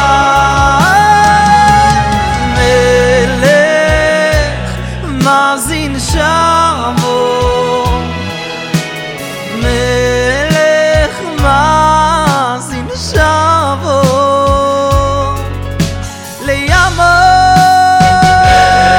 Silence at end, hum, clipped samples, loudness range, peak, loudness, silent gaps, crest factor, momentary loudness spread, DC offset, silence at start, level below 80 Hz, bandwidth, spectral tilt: 0 s; none; 0.7%; 5 LU; 0 dBFS; -9 LUFS; none; 10 dB; 12 LU; under 0.1%; 0 s; -22 dBFS; 18 kHz; -4.5 dB/octave